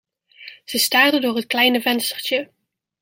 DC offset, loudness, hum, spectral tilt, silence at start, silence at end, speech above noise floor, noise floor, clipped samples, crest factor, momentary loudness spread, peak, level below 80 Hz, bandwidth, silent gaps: under 0.1%; -18 LUFS; none; -1.5 dB/octave; 0.4 s; 0.55 s; 25 dB; -43 dBFS; under 0.1%; 20 dB; 11 LU; -2 dBFS; -72 dBFS; 16.5 kHz; none